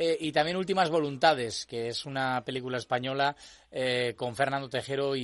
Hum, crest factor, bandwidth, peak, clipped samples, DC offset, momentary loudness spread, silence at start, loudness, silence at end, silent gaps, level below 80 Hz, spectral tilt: none; 20 dB; 11.5 kHz; -8 dBFS; under 0.1%; under 0.1%; 8 LU; 0 s; -29 LUFS; 0 s; none; -66 dBFS; -4.5 dB/octave